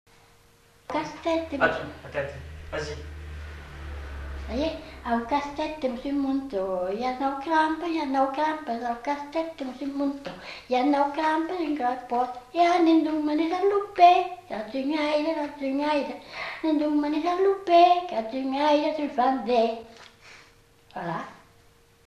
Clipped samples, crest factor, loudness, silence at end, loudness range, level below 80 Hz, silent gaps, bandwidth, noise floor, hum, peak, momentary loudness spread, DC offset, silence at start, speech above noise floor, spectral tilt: under 0.1%; 20 dB; -26 LUFS; 0.7 s; 8 LU; -48 dBFS; none; 12 kHz; -58 dBFS; none; -6 dBFS; 16 LU; under 0.1%; 0.9 s; 33 dB; -5.5 dB/octave